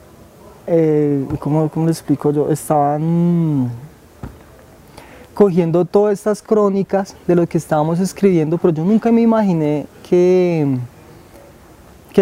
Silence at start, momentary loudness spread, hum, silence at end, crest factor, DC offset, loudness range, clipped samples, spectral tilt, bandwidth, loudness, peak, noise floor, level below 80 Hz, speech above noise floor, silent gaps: 0.45 s; 10 LU; none; 0 s; 16 dB; under 0.1%; 3 LU; under 0.1%; -8 dB/octave; 16 kHz; -16 LUFS; 0 dBFS; -43 dBFS; -50 dBFS; 28 dB; none